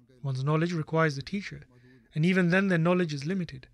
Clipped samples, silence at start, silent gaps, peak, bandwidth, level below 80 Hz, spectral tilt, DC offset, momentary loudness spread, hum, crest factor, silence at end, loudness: under 0.1%; 0.25 s; none; -14 dBFS; 10.5 kHz; -62 dBFS; -7 dB/octave; under 0.1%; 12 LU; none; 14 dB; 0.15 s; -28 LUFS